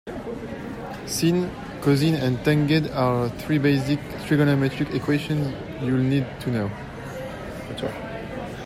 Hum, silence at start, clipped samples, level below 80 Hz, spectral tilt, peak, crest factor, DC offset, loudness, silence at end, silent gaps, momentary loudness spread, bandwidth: none; 0.05 s; under 0.1%; -48 dBFS; -6.5 dB/octave; -8 dBFS; 16 dB; under 0.1%; -24 LUFS; 0 s; none; 13 LU; 15.5 kHz